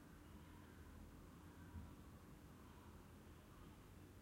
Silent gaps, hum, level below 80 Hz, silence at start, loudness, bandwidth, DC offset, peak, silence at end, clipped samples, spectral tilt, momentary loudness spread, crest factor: none; none; -68 dBFS; 0 s; -62 LUFS; 16 kHz; under 0.1%; -44 dBFS; 0 s; under 0.1%; -6 dB/octave; 4 LU; 16 dB